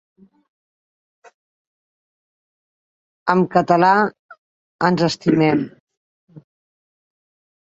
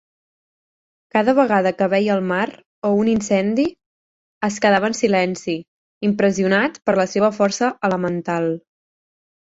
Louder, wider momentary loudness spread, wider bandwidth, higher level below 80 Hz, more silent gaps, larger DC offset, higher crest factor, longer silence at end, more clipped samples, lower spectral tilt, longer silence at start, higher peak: about the same, -17 LUFS vs -19 LUFS; about the same, 9 LU vs 8 LU; about the same, 8 kHz vs 8 kHz; about the same, -62 dBFS vs -58 dBFS; second, 4.19-4.29 s, 4.38-4.79 s, 5.80-5.87 s, 5.97-6.28 s vs 2.66-2.82 s, 3.86-4.41 s, 5.68-6.01 s; neither; about the same, 22 dB vs 18 dB; first, 1.25 s vs 0.95 s; neither; about the same, -6.5 dB/octave vs -5.5 dB/octave; first, 3.25 s vs 1.15 s; about the same, 0 dBFS vs -2 dBFS